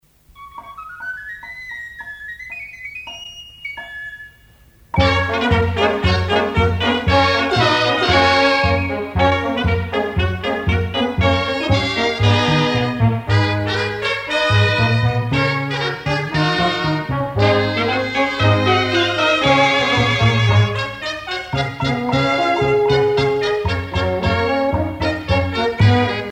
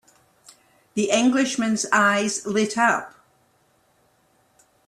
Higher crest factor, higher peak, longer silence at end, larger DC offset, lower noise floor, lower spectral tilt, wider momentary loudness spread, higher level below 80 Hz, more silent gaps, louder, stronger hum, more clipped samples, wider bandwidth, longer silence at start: about the same, 16 dB vs 20 dB; first, -2 dBFS vs -6 dBFS; second, 0 s vs 1.8 s; neither; second, -49 dBFS vs -63 dBFS; first, -6 dB/octave vs -3 dB/octave; first, 15 LU vs 9 LU; first, -34 dBFS vs -68 dBFS; neither; first, -17 LUFS vs -21 LUFS; neither; neither; second, 9.6 kHz vs 13 kHz; second, 0.4 s vs 0.95 s